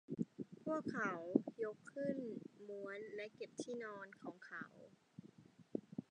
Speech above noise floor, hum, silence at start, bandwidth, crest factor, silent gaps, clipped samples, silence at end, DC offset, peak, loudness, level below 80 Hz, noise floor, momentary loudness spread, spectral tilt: 19 dB; none; 0.1 s; 10 kHz; 28 dB; none; under 0.1%; 0.1 s; under 0.1%; -18 dBFS; -46 LUFS; -88 dBFS; -65 dBFS; 18 LU; -6.5 dB/octave